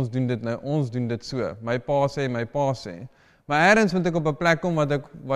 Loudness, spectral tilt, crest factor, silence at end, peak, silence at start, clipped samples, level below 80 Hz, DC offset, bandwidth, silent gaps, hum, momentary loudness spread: -24 LUFS; -6 dB/octave; 18 dB; 0 s; -6 dBFS; 0 s; under 0.1%; -54 dBFS; under 0.1%; 12 kHz; none; none; 11 LU